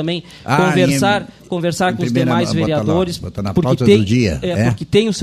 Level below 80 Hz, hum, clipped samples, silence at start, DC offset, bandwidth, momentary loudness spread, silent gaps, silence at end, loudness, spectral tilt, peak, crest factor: -40 dBFS; none; under 0.1%; 0 s; under 0.1%; 15 kHz; 9 LU; none; 0 s; -16 LUFS; -6 dB/octave; 0 dBFS; 16 dB